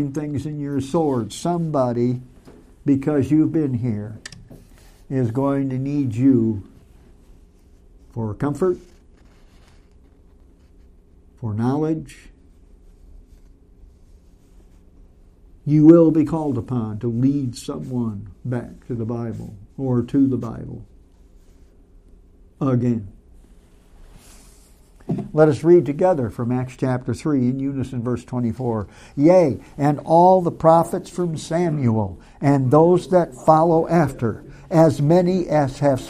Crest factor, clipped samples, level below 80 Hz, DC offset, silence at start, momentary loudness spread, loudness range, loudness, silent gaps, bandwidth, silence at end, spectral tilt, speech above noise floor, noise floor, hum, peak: 20 dB; under 0.1%; -48 dBFS; under 0.1%; 0 s; 15 LU; 11 LU; -20 LUFS; none; 13.5 kHz; 0 s; -8.5 dB/octave; 31 dB; -50 dBFS; none; 0 dBFS